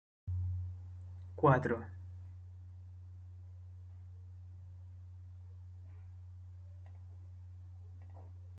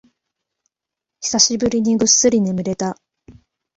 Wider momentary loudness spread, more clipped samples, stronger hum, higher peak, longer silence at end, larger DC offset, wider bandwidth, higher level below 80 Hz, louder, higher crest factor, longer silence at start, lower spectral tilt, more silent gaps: first, 20 LU vs 14 LU; neither; neither; second, -16 dBFS vs 0 dBFS; second, 0 s vs 0.45 s; neither; second, 6.6 kHz vs 8.2 kHz; second, -68 dBFS vs -52 dBFS; second, -36 LUFS vs -16 LUFS; first, 26 dB vs 20 dB; second, 0.25 s vs 1.2 s; first, -9.5 dB/octave vs -3 dB/octave; neither